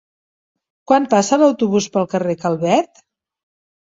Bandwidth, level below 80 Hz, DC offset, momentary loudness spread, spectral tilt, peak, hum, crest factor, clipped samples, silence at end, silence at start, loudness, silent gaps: 7.8 kHz; -62 dBFS; under 0.1%; 6 LU; -5.5 dB/octave; -2 dBFS; none; 16 dB; under 0.1%; 1.15 s; 0.9 s; -17 LUFS; none